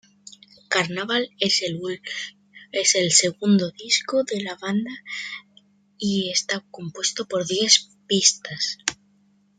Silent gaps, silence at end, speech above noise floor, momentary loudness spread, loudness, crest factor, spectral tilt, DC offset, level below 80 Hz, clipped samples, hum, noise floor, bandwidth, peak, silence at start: none; 0.65 s; 38 dB; 14 LU; -22 LUFS; 22 dB; -2 dB/octave; under 0.1%; -68 dBFS; under 0.1%; 50 Hz at -40 dBFS; -61 dBFS; 10 kHz; -2 dBFS; 0.7 s